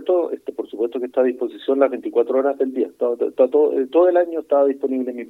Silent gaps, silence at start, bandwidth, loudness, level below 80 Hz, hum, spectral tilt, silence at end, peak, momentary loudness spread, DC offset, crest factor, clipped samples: none; 0 s; 4.1 kHz; -20 LUFS; -74 dBFS; none; -6.5 dB/octave; 0.05 s; -2 dBFS; 9 LU; under 0.1%; 16 dB; under 0.1%